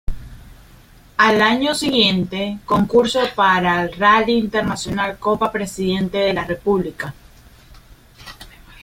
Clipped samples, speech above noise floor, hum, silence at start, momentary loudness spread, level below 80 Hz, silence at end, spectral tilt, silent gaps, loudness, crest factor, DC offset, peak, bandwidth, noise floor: under 0.1%; 28 dB; none; 0.1 s; 13 LU; -40 dBFS; 0.35 s; -4.5 dB/octave; none; -17 LUFS; 18 dB; under 0.1%; -2 dBFS; 16.5 kHz; -46 dBFS